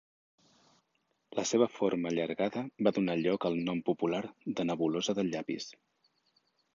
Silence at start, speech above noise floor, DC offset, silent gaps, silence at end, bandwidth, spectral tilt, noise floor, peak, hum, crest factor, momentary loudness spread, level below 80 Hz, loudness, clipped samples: 1.3 s; 46 dB; under 0.1%; none; 1 s; 7.6 kHz; -5 dB/octave; -78 dBFS; -12 dBFS; none; 20 dB; 8 LU; -74 dBFS; -32 LUFS; under 0.1%